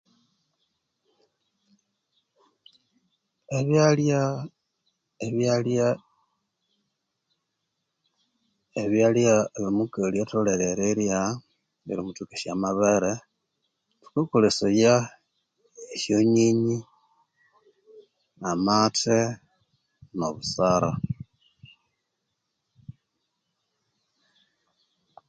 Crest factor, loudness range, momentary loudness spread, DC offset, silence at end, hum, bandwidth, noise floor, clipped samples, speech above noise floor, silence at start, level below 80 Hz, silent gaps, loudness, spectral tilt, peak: 20 dB; 6 LU; 15 LU; under 0.1%; 2.4 s; none; 9.4 kHz; -80 dBFS; under 0.1%; 57 dB; 3.5 s; -60 dBFS; none; -24 LUFS; -5.5 dB/octave; -6 dBFS